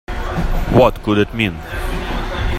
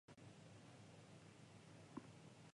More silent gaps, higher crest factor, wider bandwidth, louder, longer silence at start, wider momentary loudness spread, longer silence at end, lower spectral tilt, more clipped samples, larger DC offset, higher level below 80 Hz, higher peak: neither; second, 16 dB vs 24 dB; first, 16 kHz vs 11 kHz; first, -18 LUFS vs -62 LUFS; about the same, 0.1 s vs 0.1 s; first, 11 LU vs 5 LU; about the same, 0 s vs 0 s; about the same, -6.5 dB/octave vs -5.5 dB/octave; neither; neither; first, -24 dBFS vs -84 dBFS; first, 0 dBFS vs -38 dBFS